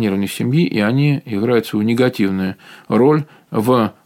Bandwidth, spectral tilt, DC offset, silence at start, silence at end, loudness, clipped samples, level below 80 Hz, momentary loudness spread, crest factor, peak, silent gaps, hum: 17 kHz; -7 dB/octave; under 0.1%; 0 s; 0.15 s; -17 LUFS; under 0.1%; -60 dBFS; 6 LU; 14 dB; -2 dBFS; none; none